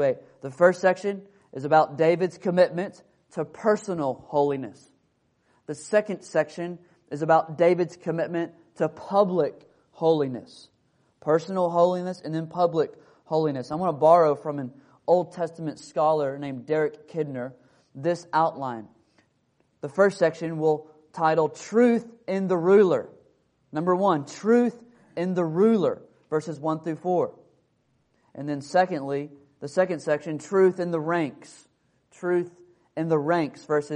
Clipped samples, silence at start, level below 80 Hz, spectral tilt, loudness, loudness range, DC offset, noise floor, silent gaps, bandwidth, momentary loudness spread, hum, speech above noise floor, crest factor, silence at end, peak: under 0.1%; 0 s; -72 dBFS; -7 dB/octave; -25 LUFS; 5 LU; under 0.1%; -69 dBFS; none; 10.5 kHz; 14 LU; none; 45 dB; 20 dB; 0 s; -4 dBFS